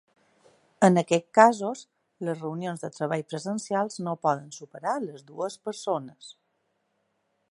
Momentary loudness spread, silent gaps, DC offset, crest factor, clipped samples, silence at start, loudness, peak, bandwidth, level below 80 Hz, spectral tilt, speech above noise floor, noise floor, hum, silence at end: 15 LU; none; under 0.1%; 26 dB; under 0.1%; 0.8 s; -27 LUFS; -2 dBFS; 11.5 kHz; -78 dBFS; -5.5 dB/octave; 48 dB; -75 dBFS; none; 1.2 s